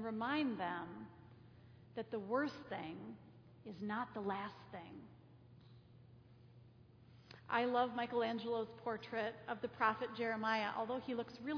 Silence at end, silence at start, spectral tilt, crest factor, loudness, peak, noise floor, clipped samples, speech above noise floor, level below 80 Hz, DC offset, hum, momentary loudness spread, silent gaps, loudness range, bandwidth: 0 s; 0 s; -3 dB/octave; 22 dB; -41 LUFS; -20 dBFS; -63 dBFS; under 0.1%; 22 dB; -78 dBFS; under 0.1%; none; 22 LU; none; 9 LU; 5.4 kHz